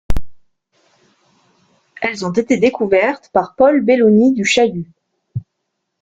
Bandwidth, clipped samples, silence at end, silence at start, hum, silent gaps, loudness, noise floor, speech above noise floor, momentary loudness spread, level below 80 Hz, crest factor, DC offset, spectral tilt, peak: 9.4 kHz; under 0.1%; 0.6 s; 0.1 s; none; none; -14 LUFS; -74 dBFS; 60 dB; 19 LU; -34 dBFS; 16 dB; under 0.1%; -5.5 dB/octave; 0 dBFS